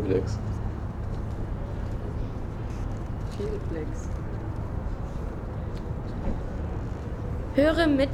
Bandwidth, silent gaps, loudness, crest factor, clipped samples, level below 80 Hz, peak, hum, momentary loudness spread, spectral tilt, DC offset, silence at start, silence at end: 13 kHz; none; -31 LUFS; 18 dB; under 0.1%; -34 dBFS; -10 dBFS; none; 11 LU; -7.5 dB/octave; under 0.1%; 0 s; 0 s